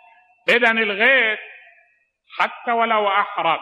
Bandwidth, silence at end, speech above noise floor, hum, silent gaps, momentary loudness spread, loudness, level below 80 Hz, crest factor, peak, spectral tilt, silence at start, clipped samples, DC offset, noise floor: 13.5 kHz; 0 s; 43 dB; none; none; 10 LU; -18 LUFS; -82 dBFS; 18 dB; -4 dBFS; -3.5 dB/octave; 0.45 s; under 0.1%; under 0.1%; -61 dBFS